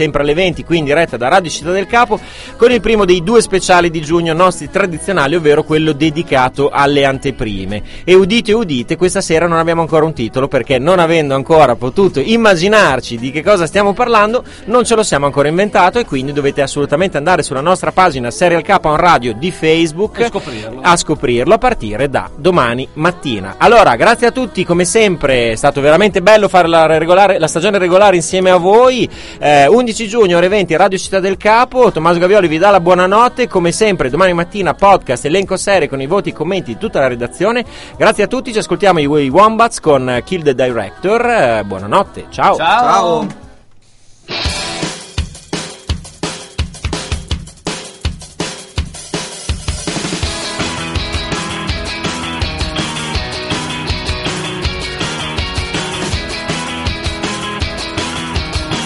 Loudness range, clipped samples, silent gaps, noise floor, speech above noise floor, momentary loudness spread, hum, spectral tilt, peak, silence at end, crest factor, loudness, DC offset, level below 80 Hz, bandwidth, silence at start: 10 LU; 0.2%; none; -42 dBFS; 30 dB; 11 LU; none; -4.5 dB/octave; 0 dBFS; 0 s; 12 dB; -12 LUFS; under 0.1%; -30 dBFS; 12 kHz; 0 s